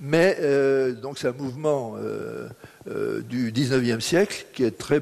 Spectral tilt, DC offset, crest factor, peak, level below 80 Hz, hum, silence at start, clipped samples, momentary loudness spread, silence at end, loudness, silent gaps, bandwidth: -5.5 dB/octave; under 0.1%; 18 dB; -6 dBFS; -60 dBFS; none; 0 s; under 0.1%; 13 LU; 0 s; -24 LUFS; none; 13.5 kHz